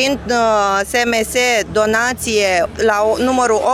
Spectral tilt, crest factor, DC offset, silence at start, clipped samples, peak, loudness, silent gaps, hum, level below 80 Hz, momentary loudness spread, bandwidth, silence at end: -3 dB/octave; 14 dB; under 0.1%; 0 s; under 0.1%; -2 dBFS; -15 LUFS; none; none; -40 dBFS; 2 LU; 16 kHz; 0 s